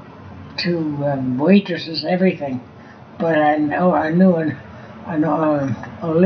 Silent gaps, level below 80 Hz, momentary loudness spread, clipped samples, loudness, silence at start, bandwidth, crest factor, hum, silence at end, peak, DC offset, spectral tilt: none; -58 dBFS; 15 LU; under 0.1%; -18 LUFS; 0 s; 6.4 kHz; 18 dB; none; 0 s; -2 dBFS; under 0.1%; -6 dB/octave